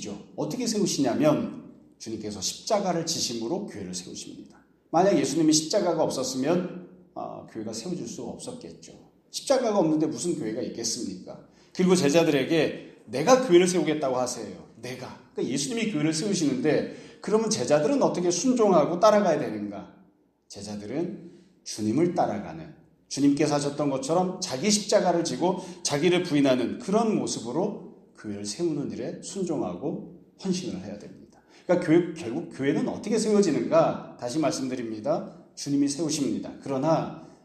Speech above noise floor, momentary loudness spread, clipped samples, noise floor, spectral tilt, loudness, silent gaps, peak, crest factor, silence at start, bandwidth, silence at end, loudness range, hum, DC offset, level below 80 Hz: 36 dB; 17 LU; under 0.1%; -61 dBFS; -4.5 dB/octave; -26 LUFS; none; -6 dBFS; 20 dB; 0 s; 13.5 kHz; 0.2 s; 7 LU; none; under 0.1%; -68 dBFS